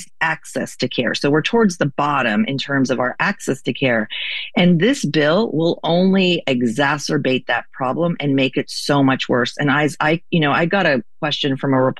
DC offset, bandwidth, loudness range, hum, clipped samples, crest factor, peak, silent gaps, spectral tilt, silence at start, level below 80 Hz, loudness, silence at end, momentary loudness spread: 1%; 12.5 kHz; 2 LU; none; under 0.1%; 16 dB; -2 dBFS; none; -5.5 dB/octave; 0 s; -54 dBFS; -18 LUFS; 0.05 s; 6 LU